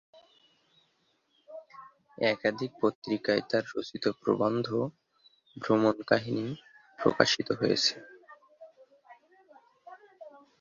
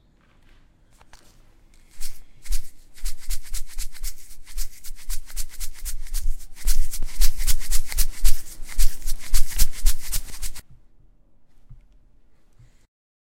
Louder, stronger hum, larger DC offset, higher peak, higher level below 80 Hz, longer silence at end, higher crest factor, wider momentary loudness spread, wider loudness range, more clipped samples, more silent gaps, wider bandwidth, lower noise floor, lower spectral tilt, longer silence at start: about the same, -29 LUFS vs -30 LUFS; neither; neither; about the same, -4 dBFS vs -2 dBFS; second, -70 dBFS vs -24 dBFS; second, 0.3 s vs 2.6 s; first, 28 dB vs 16 dB; first, 21 LU vs 14 LU; second, 4 LU vs 11 LU; neither; first, 2.95-3.02 s vs none; second, 7.4 kHz vs 16.5 kHz; first, -73 dBFS vs -55 dBFS; first, -4.5 dB/octave vs -1.5 dB/octave; second, 1.5 s vs 1.95 s